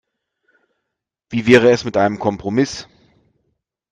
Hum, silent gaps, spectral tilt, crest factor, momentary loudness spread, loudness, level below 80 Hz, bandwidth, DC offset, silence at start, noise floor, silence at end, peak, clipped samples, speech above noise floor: none; none; -5.5 dB/octave; 20 dB; 12 LU; -16 LUFS; -54 dBFS; 9.4 kHz; under 0.1%; 1.3 s; -80 dBFS; 1.1 s; 0 dBFS; under 0.1%; 65 dB